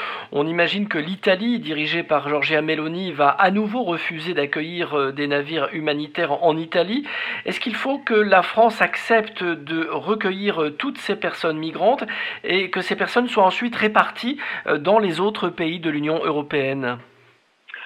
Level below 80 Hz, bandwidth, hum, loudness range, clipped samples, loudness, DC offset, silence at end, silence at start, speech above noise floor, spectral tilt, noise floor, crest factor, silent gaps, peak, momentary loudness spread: -70 dBFS; 13 kHz; none; 3 LU; under 0.1%; -21 LUFS; under 0.1%; 0 s; 0 s; 36 dB; -6 dB/octave; -57 dBFS; 20 dB; none; -2 dBFS; 8 LU